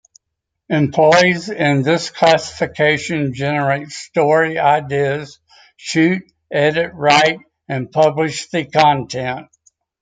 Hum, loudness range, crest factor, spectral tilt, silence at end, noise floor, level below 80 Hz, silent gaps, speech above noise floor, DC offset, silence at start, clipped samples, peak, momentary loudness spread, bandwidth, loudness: none; 2 LU; 16 dB; -5 dB/octave; 0.6 s; -78 dBFS; -56 dBFS; none; 62 dB; under 0.1%; 0.7 s; under 0.1%; 0 dBFS; 11 LU; 9.4 kHz; -16 LUFS